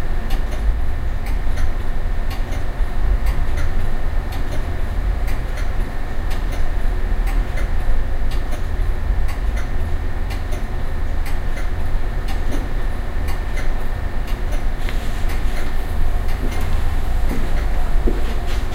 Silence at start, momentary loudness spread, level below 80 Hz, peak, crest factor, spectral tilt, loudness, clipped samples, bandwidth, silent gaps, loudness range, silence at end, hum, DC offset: 0 s; 3 LU; -18 dBFS; -4 dBFS; 12 dB; -6 dB/octave; -25 LUFS; under 0.1%; 12 kHz; none; 2 LU; 0 s; none; under 0.1%